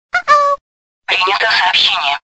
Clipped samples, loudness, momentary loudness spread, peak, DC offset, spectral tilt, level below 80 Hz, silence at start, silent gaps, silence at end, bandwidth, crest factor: under 0.1%; -12 LUFS; 8 LU; 0 dBFS; under 0.1%; 0 dB/octave; -54 dBFS; 0.15 s; 0.61-1.02 s; 0.1 s; 8.4 kHz; 14 dB